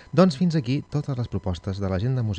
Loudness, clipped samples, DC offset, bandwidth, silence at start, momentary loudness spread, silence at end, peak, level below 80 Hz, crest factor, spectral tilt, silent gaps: -25 LUFS; under 0.1%; under 0.1%; 9.2 kHz; 0 s; 9 LU; 0 s; -4 dBFS; -48 dBFS; 20 dB; -8 dB/octave; none